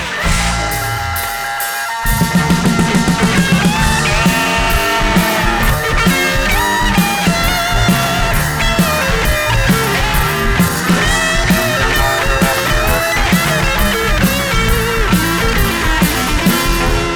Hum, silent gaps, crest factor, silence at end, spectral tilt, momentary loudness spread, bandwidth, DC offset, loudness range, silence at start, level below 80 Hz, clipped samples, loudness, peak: none; none; 12 dB; 0 s; -4 dB/octave; 3 LU; over 20 kHz; under 0.1%; 1 LU; 0 s; -20 dBFS; under 0.1%; -13 LUFS; 0 dBFS